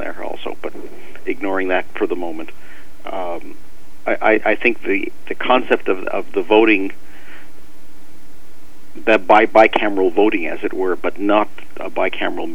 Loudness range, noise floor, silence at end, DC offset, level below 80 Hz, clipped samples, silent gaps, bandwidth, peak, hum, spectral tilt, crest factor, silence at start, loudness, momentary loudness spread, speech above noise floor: 9 LU; -46 dBFS; 0 s; 10%; -52 dBFS; under 0.1%; none; 18.5 kHz; 0 dBFS; none; -5.5 dB/octave; 20 dB; 0 s; -18 LUFS; 18 LU; 29 dB